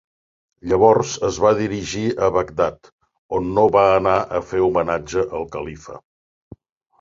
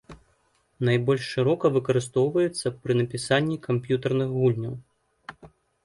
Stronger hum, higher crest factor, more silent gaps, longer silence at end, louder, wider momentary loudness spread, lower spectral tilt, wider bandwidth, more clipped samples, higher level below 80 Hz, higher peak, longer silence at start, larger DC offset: neither; about the same, 18 dB vs 18 dB; first, 2.92-2.99 s, 3.18-3.29 s vs none; first, 1 s vs 0.4 s; first, -19 LUFS vs -25 LUFS; about the same, 14 LU vs 15 LU; about the same, -5.5 dB/octave vs -6.5 dB/octave; second, 7.6 kHz vs 11.5 kHz; neither; first, -46 dBFS vs -60 dBFS; first, -2 dBFS vs -8 dBFS; first, 0.65 s vs 0.1 s; neither